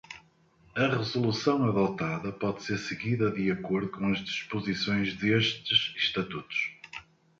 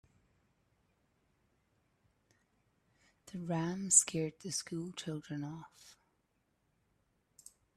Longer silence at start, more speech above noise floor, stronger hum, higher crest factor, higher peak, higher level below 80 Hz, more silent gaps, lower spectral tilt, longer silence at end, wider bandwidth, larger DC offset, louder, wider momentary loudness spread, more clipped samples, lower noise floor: second, 0.1 s vs 3.25 s; second, 33 dB vs 43 dB; neither; second, 20 dB vs 30 dB; about the same, -10 dBFS vs -10 dBFS; first, -62 dBFS vs -76 dBFS; neither; first, -5.5 dB/octave vs -3 dB/octave; second, 0.35 s vs 1.85 s; second, 7.6 kHz vs 13.5 kHz; neither; first, -29 LUFS vs -33 LUFS; second, 9 LU vs 20 LU; neither; second, -62 dBFS vs -79 dBFS